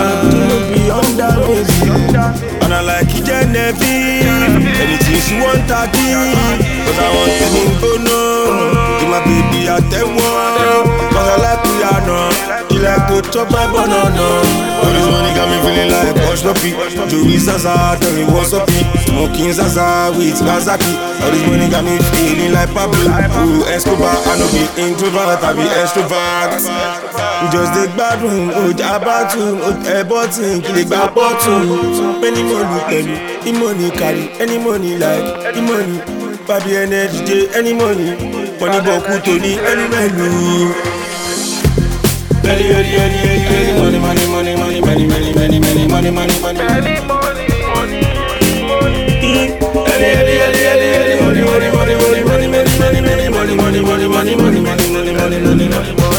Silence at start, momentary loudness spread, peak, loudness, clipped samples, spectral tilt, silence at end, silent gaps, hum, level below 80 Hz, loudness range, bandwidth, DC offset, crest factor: 0 s; 4 LU; 0 dBFS; -12 LUFS; under 0.1%; -5 dB/octave; 0 s; none; none; -24 dBFS; 3 LU; 19.5 kHz; under 0.1%; 12 dB